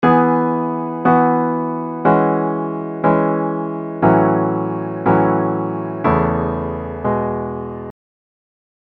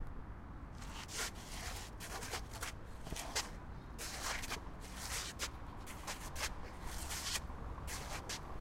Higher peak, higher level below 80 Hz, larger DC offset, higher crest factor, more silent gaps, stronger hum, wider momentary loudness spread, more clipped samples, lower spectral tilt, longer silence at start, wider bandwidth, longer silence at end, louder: first, 0 dBFS vs -24 dBFS; first, -42 dBFS vs -50 dBFS; neither; second, 16 dB vs 22 dB; neither; neither; about the same, 10 LU vs 10 LU; neither; first, -11 dB/octave vs -2.5 dB/octave; about the same, 0 s vs 0 s; second, 4.5 kHz vs 16 kHz; first, 1.05 s vs 0 s; first, -18 LUFS vs -44 LUFS